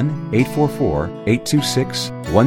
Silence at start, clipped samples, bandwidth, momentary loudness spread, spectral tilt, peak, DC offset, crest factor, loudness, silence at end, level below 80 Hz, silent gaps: 0 s; under 0.1%; 17 kHz; 5 LU; -5.5 dB/octave; 0 dBFS; under 0.1%; 16 dB; -19 LUFS; 0 s; -40 dBFS; none